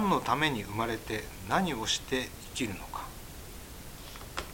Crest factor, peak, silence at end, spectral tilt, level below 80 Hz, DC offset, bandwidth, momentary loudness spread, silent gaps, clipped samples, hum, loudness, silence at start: 22 dB; -12 dBFS; 0 s; -4 dB/octave; -50 dBFS; under 0.1%; 17 kHz; 17 LU; none; under 0.1%; none; -32 LUFS; 0 s